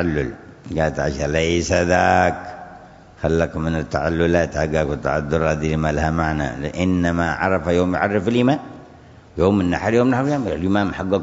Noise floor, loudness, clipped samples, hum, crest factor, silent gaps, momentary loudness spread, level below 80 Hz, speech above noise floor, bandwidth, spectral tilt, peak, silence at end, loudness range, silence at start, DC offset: -44 dBFS; -20 LUFS; under 0.1%; none; 20 dB; none; 8 LU; -36 dBFS; 25 dB; 8 kHz; -6.5 dB/octave; 0 dBFS; 0 s; 1 LU; 0 s; under 0.1%